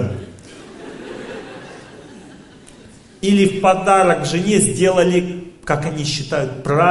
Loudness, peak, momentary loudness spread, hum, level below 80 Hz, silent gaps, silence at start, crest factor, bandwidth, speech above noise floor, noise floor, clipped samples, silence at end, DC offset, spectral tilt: -16 LUFS; 0 dBFS; 23 LU; none; -48 dBFS; none; 0 s; 18 dB; 11.5 kHz; 27 dB; -43 dBFS; under 0.1%; 0 s; under 0.1%; -5 dB/octave